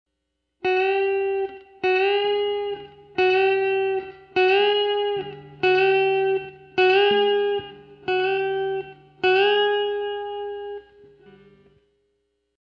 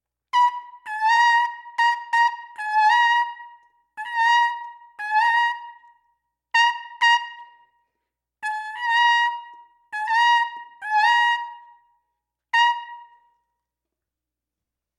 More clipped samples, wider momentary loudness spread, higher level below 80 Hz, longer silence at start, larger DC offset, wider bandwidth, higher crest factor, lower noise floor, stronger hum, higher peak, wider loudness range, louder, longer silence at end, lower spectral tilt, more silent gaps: neither; second, 14 LU vs 17 LU; first, -64 dBFS vs -88 dBFS; first, 0.65 s vs 0.35 s; neither; second, 6 kHz vs 11 kHz; about the same, 14 dB vs 18 dB; second, -78 dBFS vs -86 dBFS; neither; about the same, -8 dBFS vs -6 dBFS; about the same, 4 LU vs 4 LU; about the same, -22 LUFS vs -20 LUFS; about the same, 1.85 s vs 1.95 s; first, -5.5 dB/octave vs 5.5 dB/octave; neither